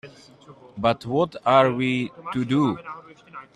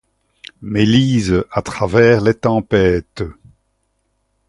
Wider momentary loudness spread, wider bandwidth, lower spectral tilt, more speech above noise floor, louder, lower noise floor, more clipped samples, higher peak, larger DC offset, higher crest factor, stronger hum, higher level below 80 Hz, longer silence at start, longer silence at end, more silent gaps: first, 23 LU vs 16 LU; about the same, 11 kHz vs 11.5 kHz; about the same, -7 dB/octave vs -6.5 dB/octave; second, 21 dB vs 52 dB; second, -22 LUFS vs -15 LUFS; second, -44 dBFS vs -66 dBFS; neither; second, -4 dBFS vs 0 dBFS; neither; about the same, 20 dB vs 16 dB; neither; second, -60 dBFS vs -38 dBFS; second, 0.05 s vs 0.6 s; second, 0.1 s vs 1.15 s; neither